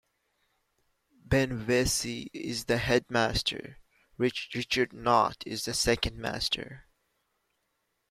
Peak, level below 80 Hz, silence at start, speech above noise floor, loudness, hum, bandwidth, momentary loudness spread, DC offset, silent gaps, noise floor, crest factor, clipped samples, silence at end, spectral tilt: -10 dBFS; -48 dBFS; 1.3 s; 49 dB; -29 LUFS; none; 16 kHz; 9 LU; under 0.1%; none; -78 dBFS; 22 dB; under 0.1%; 1.3 s; -3.5 dB/octave